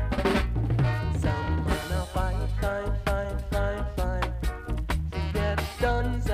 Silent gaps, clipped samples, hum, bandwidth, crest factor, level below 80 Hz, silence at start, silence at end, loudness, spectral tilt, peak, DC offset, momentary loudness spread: none; under 0.1%; none; 15.5 kHz; 16 dB; -30 dBFS; 0 s; 0 s; -28 LUFS; -6.5 dB/octave; -12 dBFS; under 0.1%; 5 LU